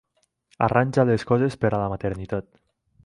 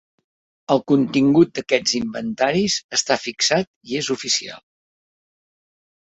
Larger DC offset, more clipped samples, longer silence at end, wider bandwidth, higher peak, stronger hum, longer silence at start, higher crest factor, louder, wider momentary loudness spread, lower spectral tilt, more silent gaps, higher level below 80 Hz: neither; neither; second, 0.65 s vs 1.55 s; first, 11 kHz vs 8.2 kHz; about the same, -4 dBFS vs -2 dBFS; neither; about the same, 0.6 s vs 0.7 s; about the same, 20 dB vs 20 dB; second, -23 LUFS vs -19 LUFS; about the same, 10 LU vs 9 LU; first, -8 dB/octave vs -3.5 dB/octave; second, none vs 2.84-2.89 s, 3.67-3.81 s; first, -48 dBFS vs -60 dBFS